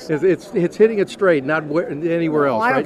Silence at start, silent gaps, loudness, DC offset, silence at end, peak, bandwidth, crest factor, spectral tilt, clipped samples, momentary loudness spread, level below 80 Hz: 0 s; none; -18 LUFS; under 0.1%; 0 s; -2 dBFS; 12.5 kHz; 14 dB; -7 dB/octave; under 0.1%; 5 LU; -62 dBFS